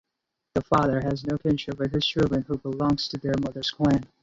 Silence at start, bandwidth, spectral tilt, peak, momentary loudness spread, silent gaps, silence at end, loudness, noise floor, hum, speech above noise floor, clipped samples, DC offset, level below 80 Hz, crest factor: 0.55 s; 7.8 kHz; -6.5 dB/octave; -8 dBFS; 6 LU; none; 0.2 s; -26 LUFS; -83 dBFS; none; 58 dB; under 0.1%; under 0.1%; -48 dBFS; 18 dB